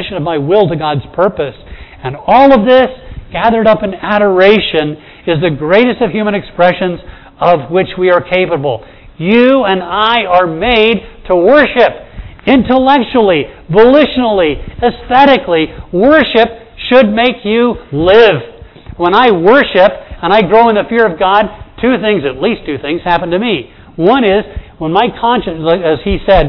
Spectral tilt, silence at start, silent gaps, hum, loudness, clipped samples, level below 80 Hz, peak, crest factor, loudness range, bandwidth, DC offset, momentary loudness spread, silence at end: -8 dB/octave; 0 s; none; none; -10 LUFS; 1%; -32 dBFS; 0 dBFS; 10 dB; 3 LU; 5.4 kHz; under 0.1%; 11 LU; 0 s